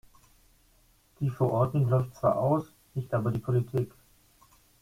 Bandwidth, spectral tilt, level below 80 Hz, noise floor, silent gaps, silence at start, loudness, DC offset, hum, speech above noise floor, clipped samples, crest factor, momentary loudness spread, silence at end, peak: 15.5 kHz; -9.5 dB/octave; -58 dBFS; -64 dBFS; none; 1.2 s; -29 LUFS; under 0.1%; none; 36 dB; under 0.1%; 18 dB; 9 LU; 0.95 s; -12 dBFS